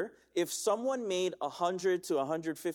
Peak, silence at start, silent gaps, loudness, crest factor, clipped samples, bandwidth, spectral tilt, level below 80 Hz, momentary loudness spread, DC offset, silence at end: -18 dBFS; 0 s; none; -33 LUFS; 16 dB; under 0.1%; 19 kHz; -4 dB/octave; -78 dBFS; 4 LU; under 0.1%; 0 s